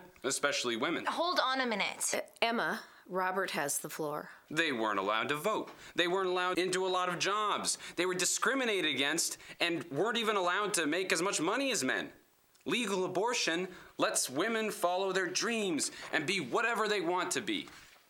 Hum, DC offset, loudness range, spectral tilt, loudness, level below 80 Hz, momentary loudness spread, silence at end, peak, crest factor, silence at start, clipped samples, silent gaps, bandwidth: none; under 0.1%; 3 LU; -2 dB/octave; -32 LUFS; -78 dBFS; 6 LU; 0.25 s; -12 dBFS; 22 dB; 0 s; under 0.1%; none; 19 kHz